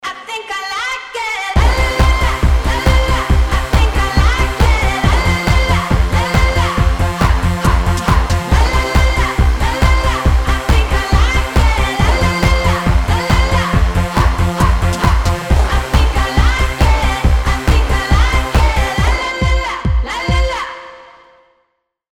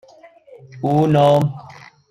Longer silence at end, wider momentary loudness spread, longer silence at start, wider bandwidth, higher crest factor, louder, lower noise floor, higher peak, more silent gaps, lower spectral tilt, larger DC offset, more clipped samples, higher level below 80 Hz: first, 1.1 s vs 0.4 s; second, 4 LU vs 12 LU; second, 0.05 s vs 0.75 s; first, 16 kHz vs 12 kHz; about the same, 12 dB vs 16 dB; about the same, -14 LUFS vs -16 LUFS; first, -66 dBFS vs -46 dBFS; about the same, 0 dBFS vs -2 dBFS; neither; second, -5 dB/octave vs -8 dB/octave; neither; neither; first, -16 dBFS vs -56 dBFS